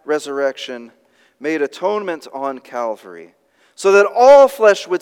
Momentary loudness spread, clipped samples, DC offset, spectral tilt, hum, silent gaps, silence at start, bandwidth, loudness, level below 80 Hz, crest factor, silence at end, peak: 19 LU; under 0.1%; under 0.1%; -3.5 dB/octave; none; none; 0.05 s; 15 kHz; -15 LUFS; -68 dBFS; 16 dB; 0.05 s; 0 dBFS